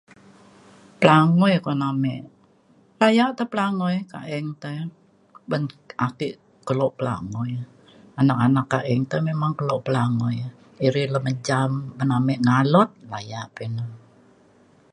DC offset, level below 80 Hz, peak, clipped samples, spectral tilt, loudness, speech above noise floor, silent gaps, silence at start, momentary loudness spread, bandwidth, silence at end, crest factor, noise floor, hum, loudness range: under 0.1%; -62 dBFS; 0 dBFS; under 0.1%; -7 dB/octave; -22 LUFS; 36 dB; none; 1 s; 15 LU; 11 kHz; 0.95 s; 22 dB; -57 dBFS; none; 7 LU